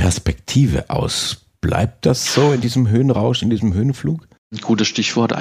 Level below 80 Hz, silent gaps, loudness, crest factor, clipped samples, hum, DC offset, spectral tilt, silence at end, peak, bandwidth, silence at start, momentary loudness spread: -36 dBFS; 4.38-4.50 s; -18 LUFS; 16 dB; under 0.1%; none; under 0.1%; -5.5 dB/octave; 0 s; 0 dBFS; 15.5 kHz; 0 s; 8 LU